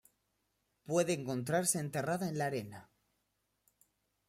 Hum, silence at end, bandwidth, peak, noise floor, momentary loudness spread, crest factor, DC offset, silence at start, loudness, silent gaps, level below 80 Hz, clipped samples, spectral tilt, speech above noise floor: none; 1.45 s; 16 kHz; -18 dBFS; -82 dBFS; 10 LU; 20 dB; under 0.1%; 0.9 s; -35 LUFS; none; -76 dBFS; under 0.1%; -4.5 dB/octave; 47 dB